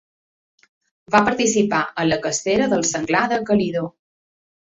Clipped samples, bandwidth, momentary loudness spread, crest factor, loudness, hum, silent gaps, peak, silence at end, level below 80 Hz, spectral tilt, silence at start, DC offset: under 0.1%; 8 kHz; 4 LU; 20 dB; -19 LUFS; none; none; -2 dBFS; 0.8 s; -54 dBFS; -4 dB/octave; 1.1 s; under 0.1%